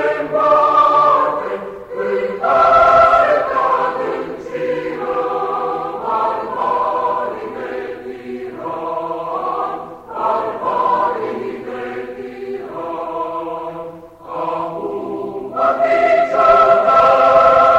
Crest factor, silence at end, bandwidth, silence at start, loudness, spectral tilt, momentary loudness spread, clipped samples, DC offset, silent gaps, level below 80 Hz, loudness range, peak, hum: 16 dB; 0 s; 8.4 kHz; 0 s; -16 LUFS; -5.5 dB/octave; 17 LU; under 0.1%; under 0.1%; none; -50 dBFS; 11 LU; 0 dBFS; none